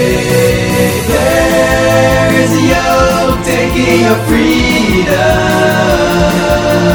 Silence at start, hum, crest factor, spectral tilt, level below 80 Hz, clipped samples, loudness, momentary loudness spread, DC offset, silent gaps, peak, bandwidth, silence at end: 0 s; none; 10 dB; -5 dB/octave; -24 dBFS; under 0.1%; -9 LUFS; 2 LU; 0.3%; none; 0 dBFS; over 20 kHz; 0 s